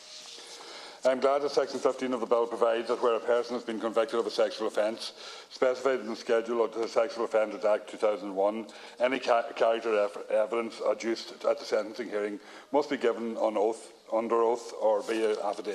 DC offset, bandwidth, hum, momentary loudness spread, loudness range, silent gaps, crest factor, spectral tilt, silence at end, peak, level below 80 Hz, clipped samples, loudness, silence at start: under 0.1%; 12.5 kHz; none; 9 LU; 2 LU; none; 18 dB; -3.5 dB/octave; 0 s; -12 dBFS; -82 dBFS; under 0.1%; -29 LUFS; 0 s